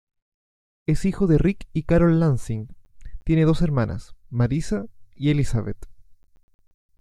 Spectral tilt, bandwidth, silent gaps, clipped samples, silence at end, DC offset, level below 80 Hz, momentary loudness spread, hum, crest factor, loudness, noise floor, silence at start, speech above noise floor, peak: -8 dB/octave; 11 kHz; none; under 0.1%; 1 s; under 0.1%; -36 dBFS; 16 LU; none; 16 dB; -23 LUFS; under -90 dBFS; 0.9 s; over 69 dB; -6 dBFS